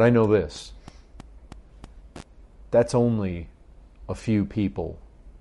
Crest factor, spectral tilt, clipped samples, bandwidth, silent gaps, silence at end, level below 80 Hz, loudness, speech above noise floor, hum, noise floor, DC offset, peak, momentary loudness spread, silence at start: 18 dB; -7.5 dB/octave; under 0.1%; 11.5 kHz; none; 0.1 s; -46 dBFS; -24 LUFS; 27 dB; none; -49 dBFS; under 0.1%; -8 dBFS; 26 LU; 0 s